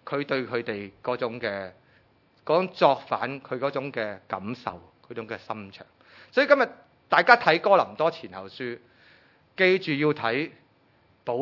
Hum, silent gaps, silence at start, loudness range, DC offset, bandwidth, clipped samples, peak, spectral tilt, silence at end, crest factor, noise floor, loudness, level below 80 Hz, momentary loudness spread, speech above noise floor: none; none; 0.05 s; 6 LU; under 0.1%; 6 kHz; under 0.1%; 0 dBFS; -6.5 dB/octave; 0 s; 26 dB; -62 dBFS; -25 LUFS; -74 dBFS; 18 LU; 37 dB